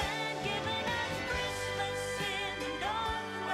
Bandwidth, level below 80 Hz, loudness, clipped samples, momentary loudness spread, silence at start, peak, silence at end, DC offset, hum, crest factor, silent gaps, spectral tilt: 16 kHz; -52 dBFS; -34 LUFS; under 0.1%; 2 LU; 0 s; -22 dBFS; 0 s; under 0.1%; none; 14 dB; none; -3.5 dB/octave